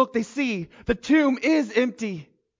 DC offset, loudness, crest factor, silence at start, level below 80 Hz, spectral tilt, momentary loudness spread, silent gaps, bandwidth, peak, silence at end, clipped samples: under 0.1%; -23 LUFS; 16 dB; 0 s; -50 dBFS; -5.5 dB/octave; 12 LU; none; 7.6 kHz; -8 dBFS; 0.35 s; under 0.1%